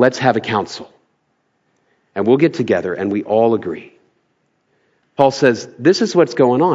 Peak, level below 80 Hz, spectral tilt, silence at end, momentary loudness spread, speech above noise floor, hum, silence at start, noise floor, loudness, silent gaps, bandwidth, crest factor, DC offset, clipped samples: 0 dBFS; -64 dBFS; -6 dB/octave; 0 s; 15 LU; 51 dB; none; 0 s; -66 dBFS; -16 LUFS; none; 7.8 kHz; 16 dB; under 0.1%; under 0.1%